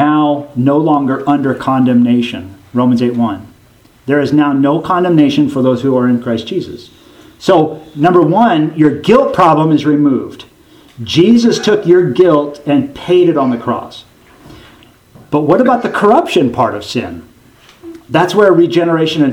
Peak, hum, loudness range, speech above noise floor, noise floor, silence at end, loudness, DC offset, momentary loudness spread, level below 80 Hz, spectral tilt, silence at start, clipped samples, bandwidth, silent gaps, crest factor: 0 dBFS; none; 3 LU; 35 dB; -45 dBFS; 0 s; -11 LUFS; under 0.1%; 11 LU; -50 dBFS; -7 dB/octave; 0 s; 0.1%; 12 kHz; none; 12 dB